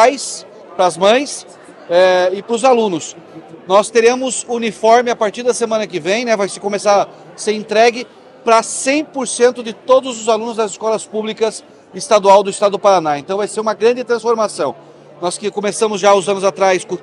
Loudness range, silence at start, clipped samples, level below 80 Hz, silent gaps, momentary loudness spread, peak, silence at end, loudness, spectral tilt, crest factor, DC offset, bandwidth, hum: 2 LU; 0 s; under 0.1%; -66 dBFS; none; 12 LU; 0 dBFS; 0 s; -15 LUFS; -3 dB/octave; 14 dB; under 0.1%; 11.5 kHz; none